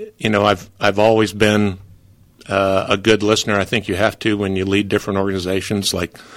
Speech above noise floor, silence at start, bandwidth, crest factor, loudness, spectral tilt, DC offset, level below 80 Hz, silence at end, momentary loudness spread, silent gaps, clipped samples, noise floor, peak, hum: 30 dB; 0 s; 16.5 kHz; 16 dB; -17 LUFS; -4.5 dB/octave; under 0.1%; -48 dBFS; 0 s; 6 LU; none; under 0.1%; -48 dBFS; 0 dBFS; none